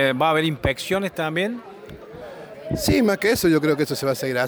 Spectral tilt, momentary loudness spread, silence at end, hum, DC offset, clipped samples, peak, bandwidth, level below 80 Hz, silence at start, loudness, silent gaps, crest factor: -5 dB/octave; 20 LU; 0 s; none; under 0.1%; under 0.1%; -8 dBFS; over 20 kHz; -44 dBFS; 0 s; -21 LUFS; none; 14 dB